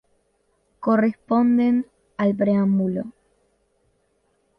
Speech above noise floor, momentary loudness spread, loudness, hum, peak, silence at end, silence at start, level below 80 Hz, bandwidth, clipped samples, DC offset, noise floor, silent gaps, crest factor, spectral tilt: 48 dB; 11 LU; -21 LUFS; none; -8 dBFS; 1.5 s; 0.8 s; -64 dBFS; 5.2 kHz; under 0.1%; under 0.1%; -67 dBFS; none; 14 dB; -10 dB/octave